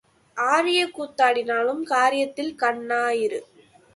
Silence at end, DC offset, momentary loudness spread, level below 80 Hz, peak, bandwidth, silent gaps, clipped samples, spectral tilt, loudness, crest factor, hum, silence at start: 0.5 s; under 0.1%; 8 LU; -72 dBFS; -6 dBFS; 11.5 kHz; none; under 0.1%; -2 dB/octave; -22 LUFS; 18 dB; none; 0.35 s